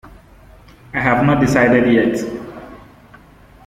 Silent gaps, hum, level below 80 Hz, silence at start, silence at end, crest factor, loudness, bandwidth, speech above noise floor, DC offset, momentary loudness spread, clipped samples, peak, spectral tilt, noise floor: none; none; -42 dBFS; 0.05 s; 0.9 s; 16 dB; -15 LUFS; 15 kHz; 30 dB; under 0.1%; 18 LU; under 0.1%; -2 dBFS; -7 dB/octave; -44 dBFS